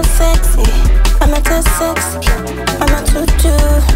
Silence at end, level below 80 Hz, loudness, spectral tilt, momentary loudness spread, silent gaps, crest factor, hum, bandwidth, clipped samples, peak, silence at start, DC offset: 0 s; -10 dBFS; -13 LUFS; -4.5 dB/octave; 4 LU; none; 8 dB; none; 16.5 kHz; under 0.1%; -2 dBFS; 0 s; under 0.1%